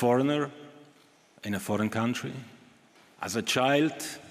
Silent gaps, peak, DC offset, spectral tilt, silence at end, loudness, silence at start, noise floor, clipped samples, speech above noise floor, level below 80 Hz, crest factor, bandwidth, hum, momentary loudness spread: none; -10 dBFS; under 0.1%; -4.5 dB/octave; 0 s; -29 LUFS; 0 s; -60 dBFS; under 0.1%; 32 dB; -76 dBFS; 20 dB; 15.5 kHz; none; 15 LU